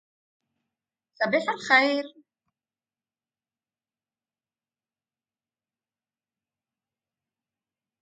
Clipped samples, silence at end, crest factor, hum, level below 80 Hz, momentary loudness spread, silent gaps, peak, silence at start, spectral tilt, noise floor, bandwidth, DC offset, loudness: under 0.1%; 5.95 s; 26 dB; none; -86 dBFS; 11 LU; none; -6 dBFS; 1.2 s; -3.5 dB/octave; under -90 dBFS; 9.2 kHz; under 0.1%; -23 LUFS